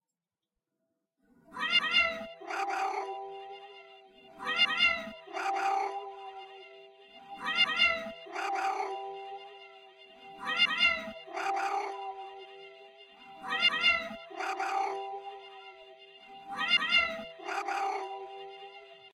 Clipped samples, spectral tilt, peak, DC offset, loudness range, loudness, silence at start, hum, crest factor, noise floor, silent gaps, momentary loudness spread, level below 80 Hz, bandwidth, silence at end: under 0.1%; -1 dB/octave; -14 dBFS; under 0.1%; 0 LU; -30 LUFS; 1.5 s; none; 20 dB; under -90 dBFS; none; 24 LU; -70 dBFS; 13.5 kHz; 0.05 s